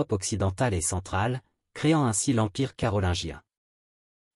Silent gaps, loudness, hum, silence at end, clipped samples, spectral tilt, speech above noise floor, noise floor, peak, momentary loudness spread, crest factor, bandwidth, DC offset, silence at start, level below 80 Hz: none; -27 LUFS; none; 0.95 s; under 0.1%; -5 dB/octave; over 64 dB; under -90 dBFS; -12 dBFS; 11 LU; 16 dB; 13.5 kHz; under 0.1%; 0 s; -48 dBFS